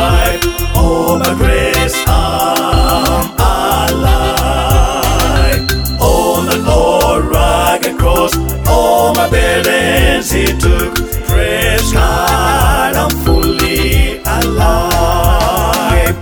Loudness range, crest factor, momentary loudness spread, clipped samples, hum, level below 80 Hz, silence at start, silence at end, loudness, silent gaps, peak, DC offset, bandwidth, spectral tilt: 1 LU; 10 dB; 3 LU; under 0.1%; none; -16 dBFS; 0 s; 0 s; -11 LUFS; none; 0 dBFS; under 0.1%; over 20 kHz; -4.5 dB/octave